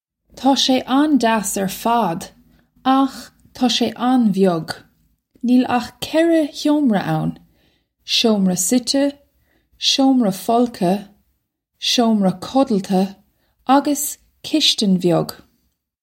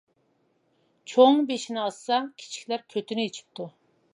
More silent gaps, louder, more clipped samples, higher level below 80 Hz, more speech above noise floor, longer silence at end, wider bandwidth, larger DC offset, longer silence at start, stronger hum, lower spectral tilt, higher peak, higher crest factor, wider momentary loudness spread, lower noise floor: neither; first, -17 LUFS vs -25 LUFS; neither; first, -58 dBFS vs -86 dBFS; first, 54 dB vs 44 dB; first, 0.7 s vs 0.45 s; first, 16.5 kHz vs 11 kHz; neither; second, 0.35 s vs 1.1 s; neither; about the same, -4.5 dB/octave vs -4 dB/octave; about the same, -2 dBFS vs -4 dBFS; second, 16 dB vs 22 dB; second, 10 LU vs 21 LU; about the same, -70 dBFS vs -69 dBFS